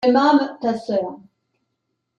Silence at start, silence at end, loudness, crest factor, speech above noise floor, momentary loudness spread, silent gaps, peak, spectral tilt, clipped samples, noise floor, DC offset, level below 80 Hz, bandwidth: 0 s; 1 s; -19 LUFS; 16 dB; 57 dB; 9 LU; none; -4 dBFS; -6 dB/octave; under 0.1%; -76 dBFS; under 0.1%; -68 dBFS; 7.6 kHz